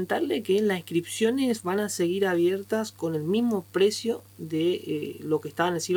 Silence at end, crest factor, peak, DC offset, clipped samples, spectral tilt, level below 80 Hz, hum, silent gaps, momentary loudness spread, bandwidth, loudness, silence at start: 0 s; 18 dB; -8 dBFS; under 0.1%; under 0.1%; -5 dB/octave; -72 dBFS; none; none; 6 LU; over 20 kHz; -27 LUFS; 0 s